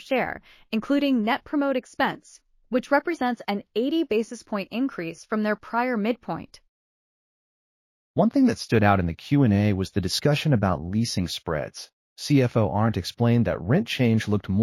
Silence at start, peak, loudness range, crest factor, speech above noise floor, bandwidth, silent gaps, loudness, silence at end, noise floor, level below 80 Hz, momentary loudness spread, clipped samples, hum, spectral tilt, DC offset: 0 s; -4 dBFS; 6 LU; 20 dB; over 66 dB; 15 kHz; 6.69-8.14 s, 11.93-12.16 s; -24 LUFS; 0 s; under -90 dBFS; -52 dBFS; 10 LU; under 0.1%; none; -6.5 dB/octave; under 0.1%